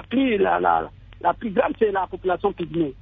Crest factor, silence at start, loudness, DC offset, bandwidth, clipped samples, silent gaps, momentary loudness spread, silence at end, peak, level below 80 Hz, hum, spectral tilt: 16 dB; 0 s; -22 LUFS; under 0.1%; 3.9 kHz; under 0.1%; none; 6 LU; 0 s; -6 dBFS; -48 dBFS; none; -9.5 dB/octave